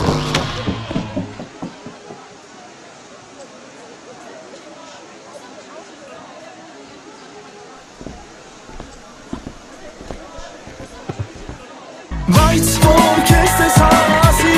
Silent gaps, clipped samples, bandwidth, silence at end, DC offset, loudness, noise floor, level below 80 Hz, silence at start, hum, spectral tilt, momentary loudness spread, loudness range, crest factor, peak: none; under 0.1%; 15.5 kHz; 0 s; under 0.1%; -13 LUFS; -39 dBFS; -28 dBFS; 0 s; none; -4.5 dB/octave; 27 LU; 23 LU; 18 dB; 0 dBFS